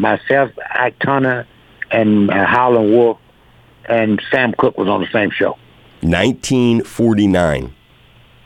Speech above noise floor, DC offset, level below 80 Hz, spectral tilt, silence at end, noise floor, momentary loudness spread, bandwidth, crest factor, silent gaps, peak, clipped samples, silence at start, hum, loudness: 33 dB; under 0.1%; -42 dBFS; -6 dB/octave; 0.75 s; -47 dBFS; 8 LU; 13.5 kHz; 14 dB; none; 0 dBFS; under 0.1%; 0 s; none; -15 LUFS